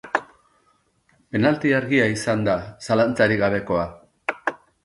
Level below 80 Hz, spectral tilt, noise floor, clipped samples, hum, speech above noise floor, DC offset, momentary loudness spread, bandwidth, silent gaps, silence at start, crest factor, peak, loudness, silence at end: -52 dBFS; -6 dB/octave; -64 dBFS; under 0.1%; none; 44 dB; under 0.1%; 11 LU; 11.5 kHz; none; 0.05 s; 18 dB; -4 dBFS; -22 LUFS; 0.3 s